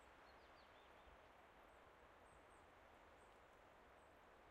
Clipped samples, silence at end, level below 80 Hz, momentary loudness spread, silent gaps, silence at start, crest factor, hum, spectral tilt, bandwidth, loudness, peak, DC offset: under 0.1%; 0 s; -78 dBFS; 2 LU; none; 0 s; 14 dB; none; -4 dB/octave; 13 kHz; -67 LUFS; -54 dBFS; under 0.1%